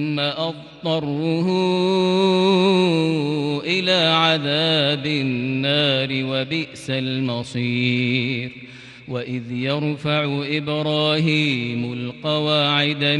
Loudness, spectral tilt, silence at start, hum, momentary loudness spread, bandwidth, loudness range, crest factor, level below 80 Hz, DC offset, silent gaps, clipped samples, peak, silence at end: -20 LUFS; -6 dB/octave; 0 s; none; 10 LU; 11.5 kHz; 6 LU; 16 dB; -62 dBFS; under 0.1%; none; under 0.1%; -4 dBFS; 0 s